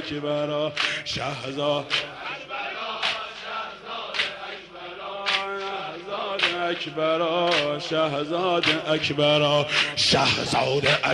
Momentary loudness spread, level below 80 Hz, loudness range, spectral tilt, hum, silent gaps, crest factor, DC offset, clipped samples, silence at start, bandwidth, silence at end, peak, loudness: 12 LU; -58 dBFS; 7 LU; -3.5 dB/octave; none; none; 16 dB; under 0.1%; under 0.1%; 0 s; 11.5 kHz; 0 s; -8 dBFS; -24 LUFS